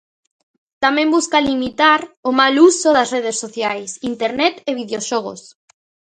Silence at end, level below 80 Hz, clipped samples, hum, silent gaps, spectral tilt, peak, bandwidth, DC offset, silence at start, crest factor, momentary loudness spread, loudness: 0.7 s; -56 dBFS; under 0.1%; none; 2.17-2.23 s; -2 dB/octave; 0 dBFS; 9.6 kHz; under 0.1%; 0.8 s; 18 dB; 12 LU; -16 LUFS